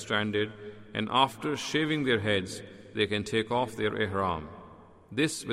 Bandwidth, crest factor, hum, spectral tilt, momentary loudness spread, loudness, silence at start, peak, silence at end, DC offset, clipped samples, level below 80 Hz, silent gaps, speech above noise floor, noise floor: 16 kHz; 22 dB; none; -4.5 dB/octave; 13 LU; -29 LUFS; 0 s; -8 dBFS; 0 s; under 0.1%; under 0.1%; -60 dBFS; none; 23 dB; -52 dBFS